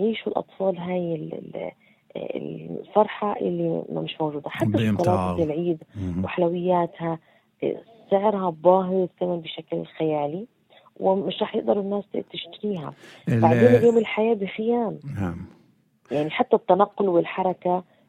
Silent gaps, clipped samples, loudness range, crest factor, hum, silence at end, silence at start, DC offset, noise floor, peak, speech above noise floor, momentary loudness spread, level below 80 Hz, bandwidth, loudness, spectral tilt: none; under 0.1%; 6 LU; 20 dB; none; 0.25 s; 0 s; under 0.1%; -60 dBFS; -4 dBFS; 37 dB; 14 LU; -60 dBFS; 12.5 kHz; -24 LUFS; -8 dB/octave